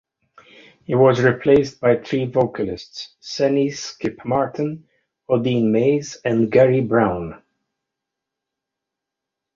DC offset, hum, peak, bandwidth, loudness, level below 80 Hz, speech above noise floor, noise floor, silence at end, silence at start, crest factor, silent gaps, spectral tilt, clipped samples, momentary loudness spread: under 0.1%; none; -2 dBFS; 7.4 kHz; -19 LUFS; -52 dBFS; 65 dB; -84 dBFS; 2.2 s; 0.9 s; 18 dB; none; -6.5 dB/octave; under 0.1%; 13 LU